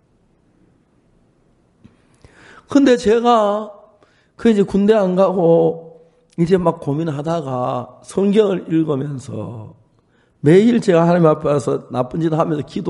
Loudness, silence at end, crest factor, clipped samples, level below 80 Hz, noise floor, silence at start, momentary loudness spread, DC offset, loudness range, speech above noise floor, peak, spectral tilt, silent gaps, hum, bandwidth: -16 LUFS; 0 s; 16 dB; under 0.1%; -52 dBFS; -58 dBFS; 2.7 s; 13 LU; under 0.1%; 4 LU; 42 dB; 0 dBFS; -7.5 dB/octave; none; none; 11.5 kHz